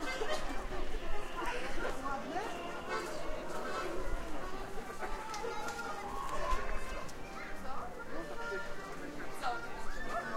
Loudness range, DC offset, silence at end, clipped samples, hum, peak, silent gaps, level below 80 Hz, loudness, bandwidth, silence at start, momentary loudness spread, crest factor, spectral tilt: 2 LU; under 0.1%; 0 s; under 0.1%; none; -20 dBFS; none; -44 dBFS; -41 LUFS; 13.5 kHz; 0 s; 6 LU; 16 dB; -4 dB/octave